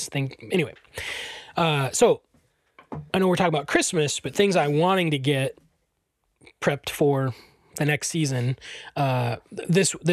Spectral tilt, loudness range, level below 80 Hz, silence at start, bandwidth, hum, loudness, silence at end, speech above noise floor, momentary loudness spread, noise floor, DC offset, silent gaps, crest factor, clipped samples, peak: -4.5 dB/octave; 4 LU; -58 dBFS; 0 s; 14.5 kHz; none; -24 LUFS; 0 s; 51 dB; 12 LU; -74 dBFS; under 0.1%; none; 16 dB; under 0.1%; -8 dBFS